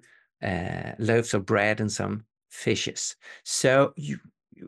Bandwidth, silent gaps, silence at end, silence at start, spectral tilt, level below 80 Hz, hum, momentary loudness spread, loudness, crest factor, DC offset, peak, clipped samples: 12.5 kHz; none; 0 s; 0.4 s; -4.5 dB/octave; -60 dBFS; none; 14 LU; -26 LUFS; 20 dB; under 0.1%; -8 dBFS; under 0.1%